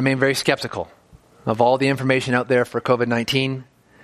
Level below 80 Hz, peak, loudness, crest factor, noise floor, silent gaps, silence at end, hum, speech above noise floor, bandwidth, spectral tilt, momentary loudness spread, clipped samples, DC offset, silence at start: -58 dBFS; -2 dBFS; -20 LUFS; 20 dB; -50 dBFS; none; 0.4 s; none; 31 dB; 15 kHz; -5 dB/octave; 12 LU; under 0.1%; under 0.1%; 0 s